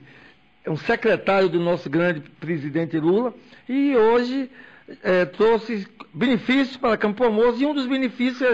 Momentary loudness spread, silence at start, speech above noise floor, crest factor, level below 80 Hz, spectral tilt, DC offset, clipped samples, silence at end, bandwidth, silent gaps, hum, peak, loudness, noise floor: 10 LU; 0.65 s; 31 dB; 10 dB; -56 dBFS; -7 dB/octave; under 0.1%; under 0.1%; 0 s; 8 kHz; none; none; -12 dBFS; -21 LUFS; -52 dBFS